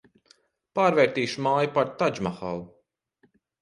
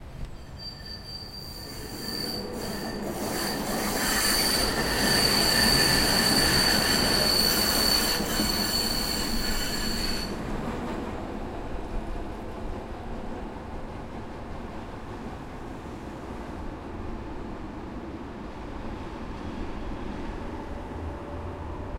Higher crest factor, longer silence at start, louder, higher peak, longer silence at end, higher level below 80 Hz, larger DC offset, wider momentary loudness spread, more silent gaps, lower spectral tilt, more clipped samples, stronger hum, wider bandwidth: about the same, 20 dB vs 20 dB; first, 0.75 s vs 0 s; about the same, -25 LUFS vs -25 LUFS; about the same, -6 dBFS vs -8 dBFS; first, 0.95 s vs 0 s; second, -62 dBFS vs -38 dBFS; neither; second, 13 LU vs 19 LU; neither; first, -5.5 dB/octave vs -2.5 dB/octave; neither; neither; second, 11 kHz vs 16.5 kHz